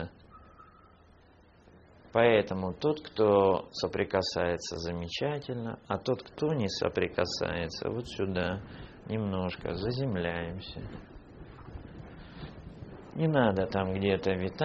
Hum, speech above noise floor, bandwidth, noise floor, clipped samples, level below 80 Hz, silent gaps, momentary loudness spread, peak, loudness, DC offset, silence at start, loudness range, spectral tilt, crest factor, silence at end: none; 29 dB; 7.4 kHz; -59 dBFS; under 0.1%; -54 dBFS; none; 21 LU; -8 dBFS; -31 LUFS; under 0.1%; 0 s; 8 LU; -5 dB/octave; 22 dB; 0 s